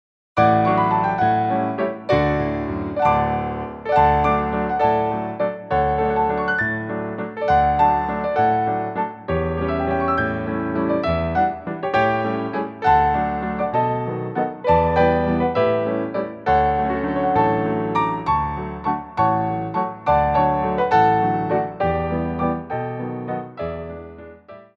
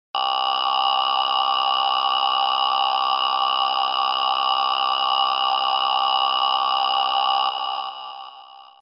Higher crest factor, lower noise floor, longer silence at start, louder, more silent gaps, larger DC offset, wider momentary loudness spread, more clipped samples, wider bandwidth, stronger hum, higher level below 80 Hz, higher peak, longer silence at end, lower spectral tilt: about the same, 16 dB vs 14 dB; about the same, -42 dBFS vs -44 dBFS; first, 0.35 s vs 0.15 s; about the same, -20 LUFS vs -20 LUFS; neither; neither; first, 9 LU vs 4 LU; neither; about the same, 6.6 kHz vs 6 kHz; neither; first, -38 dBFS vs -70 dBFS; about the same, -4 dBFS vs -6 dBFS; about the same, 0.15 s vs 0.15 s; first, -8.5 dB/octave vs -2 dB/octave